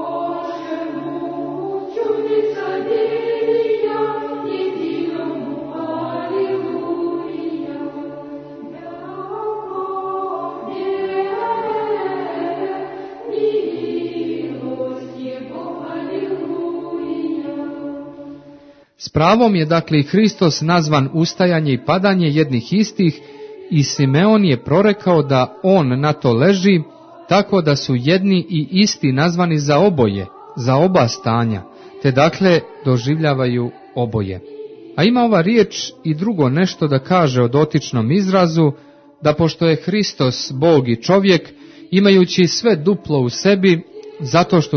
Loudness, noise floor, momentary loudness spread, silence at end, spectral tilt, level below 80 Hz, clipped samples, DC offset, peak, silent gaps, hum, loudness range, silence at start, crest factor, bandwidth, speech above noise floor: -17 LUFS; -44 dBFS; 14 LU; 0 s; -6.5 dB/octave; -54 dBFS; under 0.1%; under 0.1%; 0 dBFS; none; none; 10 LU; 0 s; 16 dB; 6.6 kHz; 30 dB